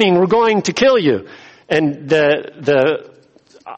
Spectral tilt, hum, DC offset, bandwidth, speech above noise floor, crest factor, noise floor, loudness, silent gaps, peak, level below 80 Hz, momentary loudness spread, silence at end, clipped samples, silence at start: -5 dB/octave; none; under 0.1%; 8.4 kHz; 34 dB; 14 dB; -48 dBFS; -15 LUFS; none; -2 dBFS; -56 dBFS; 6 LU; 0.05 s; under 0.1%; 0 s